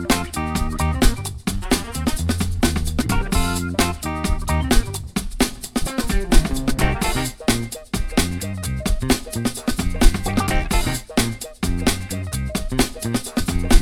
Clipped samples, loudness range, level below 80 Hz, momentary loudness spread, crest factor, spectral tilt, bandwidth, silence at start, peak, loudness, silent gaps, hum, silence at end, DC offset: under 0.1%; 1 LU; -24 dBFS; 6 LU; 20 dB; -4.5 dB/octave; 18 kHz; 0 s; 0 dBFS; -22 LUFS; none; none; 0 s; 0.7%